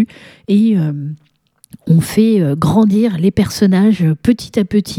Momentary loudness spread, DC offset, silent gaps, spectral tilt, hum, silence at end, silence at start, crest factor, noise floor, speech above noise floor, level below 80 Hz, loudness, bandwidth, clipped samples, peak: 9 LU; under 0.1%; none; -7.5 dB/octave; none; 0 s; 0 s; 14 dB; -42 dBFS; 29 dB; -42 dBFS; -13 LUFS; 15.5 kHz; under 0.1%; 0 dBFS